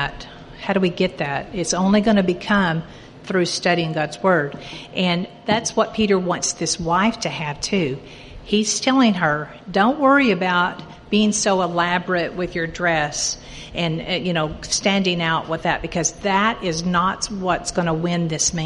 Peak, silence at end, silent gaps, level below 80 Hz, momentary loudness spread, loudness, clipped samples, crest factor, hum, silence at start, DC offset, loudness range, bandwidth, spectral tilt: -2 dBFS; 0 s; none; -46 dBFS; 8 LU; -20 LUFS; under 0.1%; 18 dB; none; 0 s; under 0.1%; 3 LU; 11.5 kHz; -4 dB/octave